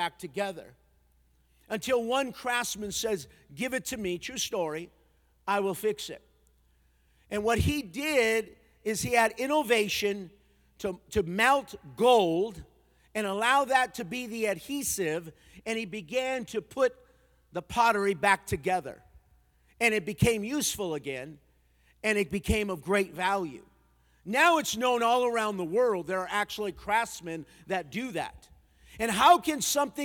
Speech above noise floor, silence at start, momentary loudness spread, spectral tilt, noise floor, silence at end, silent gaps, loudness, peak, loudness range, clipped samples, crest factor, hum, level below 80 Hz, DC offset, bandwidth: 37 dB; 0 s; 14 LU; -3.5 dB/octave; -66 dBFS; 0 s; none; -28 LUFS; -8 dBFS; 6 LU; under 0.1%; 22 dB; none; -54 dBFS; under 0.1%; 19 kHz